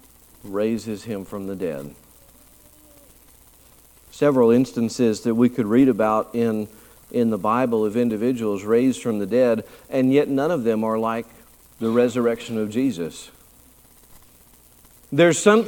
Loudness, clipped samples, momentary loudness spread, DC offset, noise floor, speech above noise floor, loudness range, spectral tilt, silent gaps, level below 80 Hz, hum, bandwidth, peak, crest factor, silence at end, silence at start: -21 LUFS; under 0.1%; 13 LU; under 0.1%; -52 dBFS; 32 dB; 10 LU; -6 dB/octave; none; -58 dBFS; none; 19 kHz; -2 dBFS; 20 dB; 0 s; 0.45 s